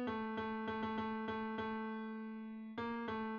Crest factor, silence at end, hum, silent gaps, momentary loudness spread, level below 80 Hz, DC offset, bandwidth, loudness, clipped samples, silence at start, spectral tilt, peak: 12 dB; 0 s; none; none; 6 LU; -70 dBFS; under 0.1%; 6.6 kHz; -43 LUFS; under 0.1%; 0 s; -4 dB/octave; -30 dBFS